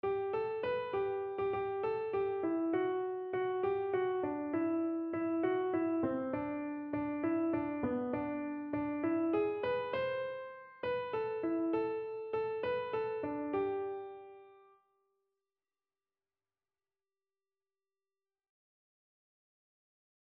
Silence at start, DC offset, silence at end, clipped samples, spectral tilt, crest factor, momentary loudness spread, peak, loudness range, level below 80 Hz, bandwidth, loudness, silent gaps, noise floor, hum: 0.05 s; under 0.1%; 5.7 s; under 0.1%; -5.5 dB/octave; 16 dB; 6 LU; -22 dBFS; 5 LU; -70 dBFS; 4.9 kHz; -36 LUFS; none; under -90 dBFS; none